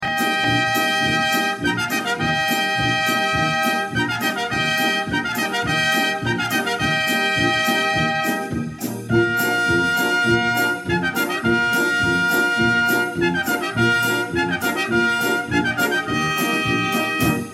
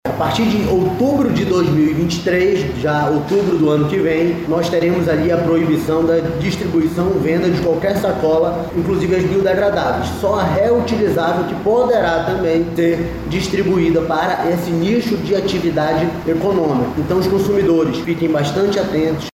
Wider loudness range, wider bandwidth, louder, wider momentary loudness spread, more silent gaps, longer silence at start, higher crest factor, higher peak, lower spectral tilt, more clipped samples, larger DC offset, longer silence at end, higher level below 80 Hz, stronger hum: about the same, 1 LU vs 1 LU; about the same, 16.5 kHz vs 16 kHz; second, -19 LUFS vs -16 LUFS; about the same, 4 LU vs 4 LU; neither; about the same, 0 s vs 0.05 s; about the same, 14 dB vs 12 dB; about the same, -6 dBFS vs -4 dBFS; second, -4 dB/octave vs -6.5 dB/octave; neither; neither; about the same, 0 s vs 0.1 s; second, -46 dBFS vs -38 dBFS; neither